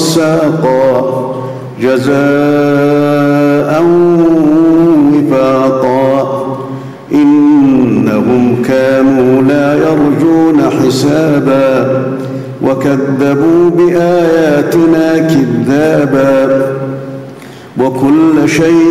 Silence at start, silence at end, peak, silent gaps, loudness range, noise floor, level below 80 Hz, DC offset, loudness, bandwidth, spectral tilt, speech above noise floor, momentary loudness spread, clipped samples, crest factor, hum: 0 s; 0 s; -2 dBFS; none; 2 LU; -29 dBFS; -44 dBFS; under 0.1%; -9 LUFS; 15.5 kHz; -7 dB/octave; 21 dB; 9 LU; under 0.1%; 8 dB; none